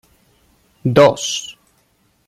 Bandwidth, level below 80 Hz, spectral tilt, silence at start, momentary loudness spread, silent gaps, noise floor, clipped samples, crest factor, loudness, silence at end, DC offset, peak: 14 kHz; -54 dBFS; -4.5 dB/octave; 0.85 s; 14 LU; none; -60 dBFS; under 0.1%; 18 dB; -15 LUFS; 0.75 s; under 0.1%; 0 dBFS